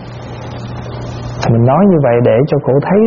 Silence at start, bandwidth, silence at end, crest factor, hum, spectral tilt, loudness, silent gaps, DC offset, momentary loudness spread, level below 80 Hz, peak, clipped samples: 0 s; 7 kHz; 0 s; 12 dB; none; -8 dB/octave; -11 LUFS; none; under 0.1%; 16 LU; -36 dBFS; 0 dBFS; under 0.1%